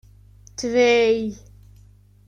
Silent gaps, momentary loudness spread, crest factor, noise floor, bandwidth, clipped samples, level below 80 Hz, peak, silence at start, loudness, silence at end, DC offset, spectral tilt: none; 15 LU; 16 dB; -51 dBFS; 9.6 kHz; under 0.1%; -52 dBFS; -8 dBFS; 0.6 s; -20 LUFS; 0.95 s; under 0.1%; -4 dB/octave